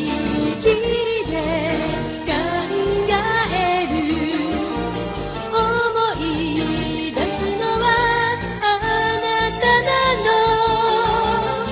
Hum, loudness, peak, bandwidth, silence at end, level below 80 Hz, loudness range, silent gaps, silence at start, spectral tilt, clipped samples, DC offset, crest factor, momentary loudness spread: none; -19 LUFS; -4 dBFS; 4 kHz; 0 s; -38 dBFS; 4 LU; none; 0 s; -9 dB/octave; under 0.1%; under 0.1%; 16 dB; 7 LU